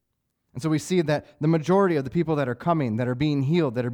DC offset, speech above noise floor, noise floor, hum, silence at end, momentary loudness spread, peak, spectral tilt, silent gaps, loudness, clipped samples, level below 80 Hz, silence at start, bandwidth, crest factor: under 0.1%; 53 dB; -77 dBFS; none; 0 s; 6 LU; -10 dBFS; -7 dB/octave; none; -24 LUFS; under 0.1%; -58 dBFS; 0.55 s; 14.5 kHz; 14 dB